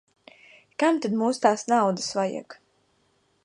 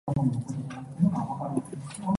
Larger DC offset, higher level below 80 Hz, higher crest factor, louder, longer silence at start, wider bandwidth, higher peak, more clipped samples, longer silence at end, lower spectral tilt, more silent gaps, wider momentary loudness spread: neither; second, -76 dBFS vs -56 dBFS; first, 22 dB vs 16 dB; first, -24 LUFS vs -30 LUFS; first, 0.8 s vs 0.05 s; about the same, 11 kHz vs 11.5 kHz; first, -6 dBFS vs -12 dBFS; neither; first, 0.9 s vs 0 s; second, -4.5 dB/octave vs -8 dB/octave; neither; about the same, 9 LU vs 10 LU